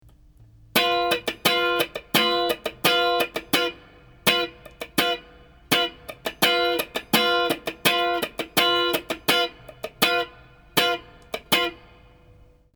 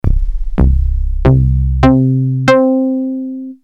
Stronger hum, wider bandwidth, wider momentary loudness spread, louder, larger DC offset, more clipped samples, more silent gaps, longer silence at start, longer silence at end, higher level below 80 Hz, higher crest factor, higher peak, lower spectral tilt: neither; first, over 20 kHz vs 7.8 kHz; about the same, 10 LU vs 10 LU; second, -22 LUFS vs -13 LUFS; second, under 0.1% vs 0.2%; second, under 0.1% vs 0.1%; neither; first, 0.75 s vs 0.05 s; first, 1 s vs 0.1 s; second, -54 dBFS vs -16 dBFS; first, 24 dB vs 12 dB; about the same, -2 dBFS vs 0 dBFS; second, -2.5 dB/octave vs -8.5 dB/octave